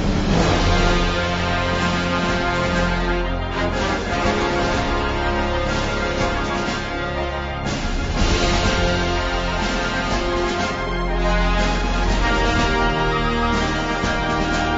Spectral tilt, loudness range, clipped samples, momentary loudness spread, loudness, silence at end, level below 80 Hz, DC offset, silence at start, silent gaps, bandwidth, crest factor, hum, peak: -5 dB/octave; 2 LU; under 0.1%; 5 LU; -20 LUFS; 0 s; -26 dBFS; under 0.1%; 0 s; none; 7.8 kHz; 14 dB; none; -4 dBFS